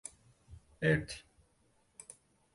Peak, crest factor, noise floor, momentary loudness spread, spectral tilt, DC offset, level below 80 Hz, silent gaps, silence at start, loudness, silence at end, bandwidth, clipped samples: -18 dBFS; 22 dB; -72 dBFS; 23 LU; -5.5 dB/octave; under 0.1%; -60 dBFS; none; 0.5 s; -34 LUFS; 1.35 s; 11.5 kHz; under 0.1%